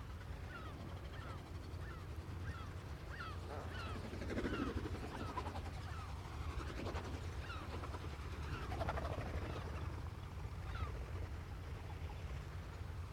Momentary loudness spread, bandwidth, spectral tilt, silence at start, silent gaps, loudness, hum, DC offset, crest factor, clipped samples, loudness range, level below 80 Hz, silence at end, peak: 7 LU; 16 kHz; -6.5 dB/octave; 0 s; none; -47 LUFS; none; under 0.1%; 22 dB; under 0.1%; 3 LU; -50 dBFS; 0 s; -24 dBFS